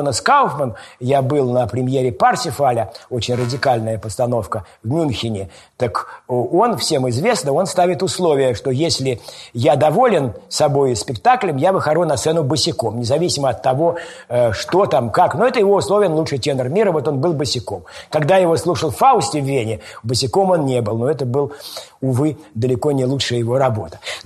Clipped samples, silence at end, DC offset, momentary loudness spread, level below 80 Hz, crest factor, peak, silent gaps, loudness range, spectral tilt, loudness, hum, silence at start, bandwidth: under 0.1%; 0.05 s; under 0.1%; 10 LU; -50 dBFS; 16 dB; -2 dBFS; none; 3 LU; -5 dB/octave; -17 LUFS; none; 0 s; 13 kHz